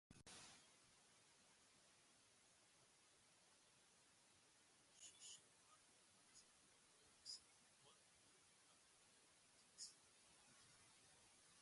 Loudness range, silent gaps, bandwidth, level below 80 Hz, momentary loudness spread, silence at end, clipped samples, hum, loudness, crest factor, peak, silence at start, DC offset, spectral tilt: 3 LU; none; 11.5 kHz; under -90 dBFS; 11 LU; 0 s; under 0.1%; none; -63 LUFS; 26 dB; -44 dBFS; 0.1 s; under 0.1%; -0.5 dB/octave